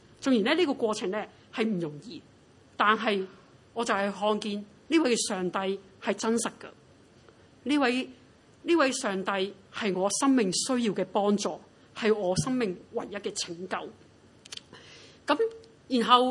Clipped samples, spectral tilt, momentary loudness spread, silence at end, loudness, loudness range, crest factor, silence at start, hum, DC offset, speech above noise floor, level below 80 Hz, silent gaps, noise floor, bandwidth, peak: under 0.1%; -4 dB/octave; 17 LU; 0 s; -28 LUFS; 5 LU; 24 dB; 0.2 s; none; under 0.1%; 29 dB; -70 dBFS; none; -56 dBFS; 11.5 kHz; -6 dBFS